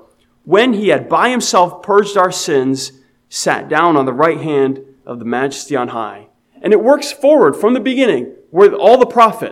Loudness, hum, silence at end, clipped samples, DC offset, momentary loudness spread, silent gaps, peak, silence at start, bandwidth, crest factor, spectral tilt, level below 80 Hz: -13 LUFS; none; 0 s; 0.3%; under 0.1%; 12 LU; none; 0 dBFS; 0.45 s; 15 kHz; 14 dB; -4 dB/octave; -64 dBFS